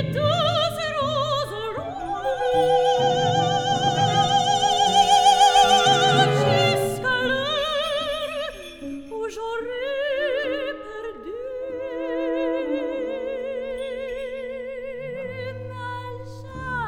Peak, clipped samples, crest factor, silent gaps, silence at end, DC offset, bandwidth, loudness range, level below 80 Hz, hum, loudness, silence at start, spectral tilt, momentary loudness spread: -4 dBFS; under 0.1%; 20 dB; none; 0 s; under 0.1%; 18 kHz; 12 LU; -50 dBFS; none; -22 LUFS; 0 s; -3.5 dB/octave; 17 LU